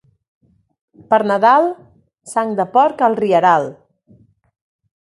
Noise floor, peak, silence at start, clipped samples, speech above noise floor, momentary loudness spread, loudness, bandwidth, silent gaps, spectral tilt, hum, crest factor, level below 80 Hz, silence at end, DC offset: -51 dBFS; 0 dBFS; 1.1 s; under 0.1%; 37 dB; 10 LU; -15 LUFS; 11.5 kHz; none; -5.5 dB/octave; none; 18 dB; -64 dBFS; 1.35 s; under 0.1%